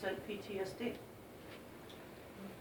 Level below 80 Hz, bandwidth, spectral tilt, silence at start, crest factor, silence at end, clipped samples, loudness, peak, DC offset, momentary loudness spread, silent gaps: -70 dBFS; over 20 kHz; -5 dB/octave; 0 s; 20 dB; 0 s; under 0.1%; -47 LUFS; -26 dBFS; under 0.1%; 11 LU; none